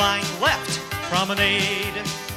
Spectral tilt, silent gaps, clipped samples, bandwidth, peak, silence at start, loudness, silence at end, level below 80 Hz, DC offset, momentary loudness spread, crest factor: -3 dB/octave; none; under 0.1%; 16.5 kHz; -6 dBFS; 0 s; -22 LUFS; 0 s; -46 dBFS; under 0.1%; 8 LU; 18 dB